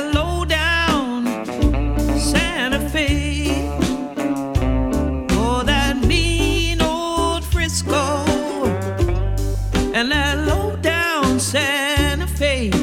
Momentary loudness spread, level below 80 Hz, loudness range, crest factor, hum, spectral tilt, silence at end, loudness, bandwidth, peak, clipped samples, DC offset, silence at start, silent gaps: 4 LU; -24 dBFS; 2 LU; 16 dB; none; -4.5 dB/octave; 0 s; -19 LUFS; 17 kHz; -2 dBFS; under 0.1%; under 0.1%; 0 s; none